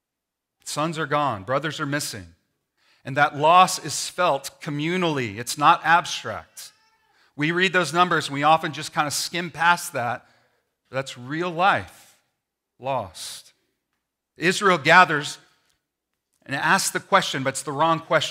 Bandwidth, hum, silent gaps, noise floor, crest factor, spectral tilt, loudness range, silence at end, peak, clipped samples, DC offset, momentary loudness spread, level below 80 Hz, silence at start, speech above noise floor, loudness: 16 kHz; none; none; -84 dBFS; 22 dB; -3.5 dB/octave; 7 LU; 0 s; -2 dBFS; under 0.1%; under 0.1%; 17 LU; -70 dBFS; 0.65 s; 62 dB; -22 LUFS